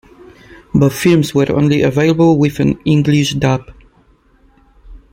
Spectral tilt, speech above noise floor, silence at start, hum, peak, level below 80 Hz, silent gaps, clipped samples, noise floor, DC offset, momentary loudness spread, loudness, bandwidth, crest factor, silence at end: -6.5 dB/octave; 39 dB; 0.5 s; none; -2 dBFS; -40 dBFS; none; under 0.1%; -51 dBFS; under 0.1%; 5 LU; -13 LUFS; 16.5 kHz; 12 dB; 0.15 s